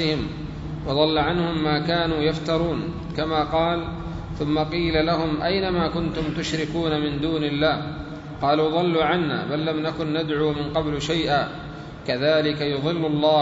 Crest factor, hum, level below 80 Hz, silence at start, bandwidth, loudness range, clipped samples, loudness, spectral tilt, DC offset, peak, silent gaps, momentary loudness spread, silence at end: 18 dB; none; -42 dBFS; 0 s; 8 kHz; 1 LU; under 0.1%; -23 LUFS; -6.5 dB/octave; under 0.1%; -6 dBFS; none; 10 LU; 0 s